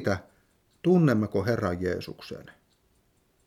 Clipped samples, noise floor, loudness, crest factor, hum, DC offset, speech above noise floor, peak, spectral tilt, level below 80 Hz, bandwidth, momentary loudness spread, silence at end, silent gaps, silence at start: under 0.1%; -67 dBFS; -26 LUFS; 18 dB; none; under 0.1%; 42 dB; -10 dBFS; -8 dB/octave; -58 dBFS; 15 kHz; 20 LU; 0.95 s; none; 0 s